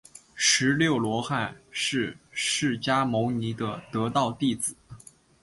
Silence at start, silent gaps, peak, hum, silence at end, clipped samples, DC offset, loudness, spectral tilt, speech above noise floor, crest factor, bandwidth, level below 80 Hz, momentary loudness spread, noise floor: 0.35 s; none; -8 dBFS; none; 0.45 s; under 0.1%; under 0.1%; -26 LUFS; -3.5 dB/octave; 23 dB; 20 dB; 11.5 kHz; -60 dBFS; 10 LU; -49 dBFS